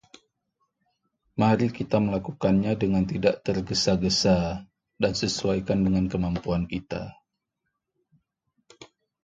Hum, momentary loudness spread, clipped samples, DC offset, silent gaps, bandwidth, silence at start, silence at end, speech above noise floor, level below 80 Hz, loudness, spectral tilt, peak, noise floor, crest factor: none; 10 LU; under 0.1%; under 0.1%; none; 9 kHz; 1.35 s; 0.4 s; 57 dB; -46 dBFS; -25 LUFS; -5.5 dB/octave; -6 dBFS; -81 dBFS; 20 dB